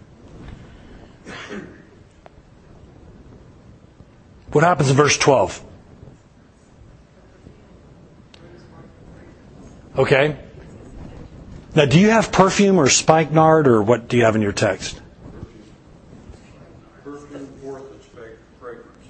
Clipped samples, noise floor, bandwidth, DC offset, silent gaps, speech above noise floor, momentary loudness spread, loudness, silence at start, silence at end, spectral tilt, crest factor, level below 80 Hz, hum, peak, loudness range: under 0.1%; -50 dBFS; 8.8 kHz; under 0.1%; none; 35 dB; 26 LU; -16 LUFS; 0.35 s; 0.35 s; -5 dB/octave; 22 dB; -46 dBFS; none; 0 dBFS; 24 LU